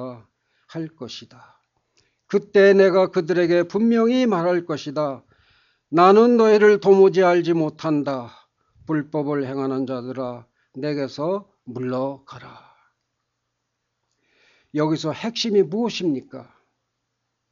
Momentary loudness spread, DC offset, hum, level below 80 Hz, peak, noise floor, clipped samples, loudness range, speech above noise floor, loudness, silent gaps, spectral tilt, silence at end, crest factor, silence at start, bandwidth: 18 LU; under 0.1%; none; -70 dBFS; -2 dBFS; -77 dBFS; under 0.1%; 13 LU; 58 dB; -19 LUFS; none; -6.5 dB/octave; 1.1 s; 20 dB; 0 s; 7.4 kHz